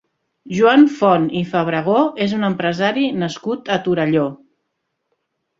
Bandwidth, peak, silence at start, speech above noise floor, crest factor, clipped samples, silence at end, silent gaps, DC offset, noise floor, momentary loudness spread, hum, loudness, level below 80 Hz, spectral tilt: 7.6 kHz; -2 dBFS; 0.45 s; 57 dB; 16 dB; under 0.1%; 1.25 s; none; under 0.1%; -74 dBFS; 10 LU; none; -17 LUFS; -58 dBFS; -6.5 dB/octave